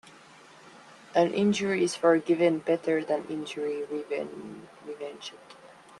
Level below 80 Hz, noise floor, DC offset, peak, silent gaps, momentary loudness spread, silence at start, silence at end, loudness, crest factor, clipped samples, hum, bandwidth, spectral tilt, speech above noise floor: -74 dBFS; -53 dBFS; under 0.1%; -10 dBFS; none; 19 LU; 0.05 s; 0.3 s; -27 LUFS; 20 dB; under 0.1%; none; 11.5 kHz; -5 dB/octave; 25 dB